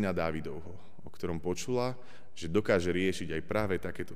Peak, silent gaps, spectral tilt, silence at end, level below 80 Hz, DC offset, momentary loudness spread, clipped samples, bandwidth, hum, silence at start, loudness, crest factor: -16 dBFS; none; -5.5 dB/octave; 0 s; -54 dBFS; 1%; 18 LU; under 0.1%; 15.5 kHz; none; 0 s; -33 LUFS; 18 dB